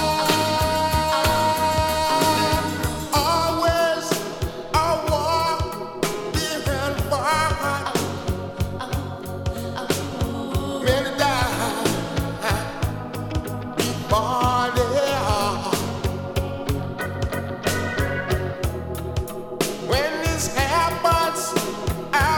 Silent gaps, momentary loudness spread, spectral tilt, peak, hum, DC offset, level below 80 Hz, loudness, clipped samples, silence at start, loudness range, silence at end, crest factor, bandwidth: none; 9 LU; -4.5 dB/octave; -4 dBFS; none; under 0.1%; -34 dBFS; -23 LUFS; under 0.1%; 0 s; 5 LU; 0 s; 18 dB; 19 kHz